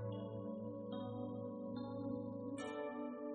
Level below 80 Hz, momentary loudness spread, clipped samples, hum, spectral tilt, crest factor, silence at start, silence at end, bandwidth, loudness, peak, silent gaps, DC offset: -76 dBFS; 2 LU; under 0.1%; none; -7 dB/octave; 12 dB; 0 s; 0 s; 4.5 kHz; -46 LUFS; -34 dBFS; none; under 0.1%